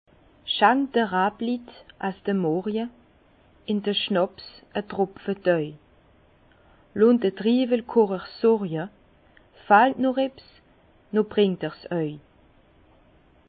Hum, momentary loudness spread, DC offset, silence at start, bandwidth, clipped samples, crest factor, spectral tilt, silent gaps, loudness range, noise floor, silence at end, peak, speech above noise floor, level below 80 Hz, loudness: none; 13 LU; under 0.1%; 0.45 s; 4.8 kHz; under 0.1%; 22 dB; -10.5 dB/octave; none; 5 LU; -58 dBFS; 1.3 s; -4 dBFS; 35 dB; -62 dBFS; -24 LUFS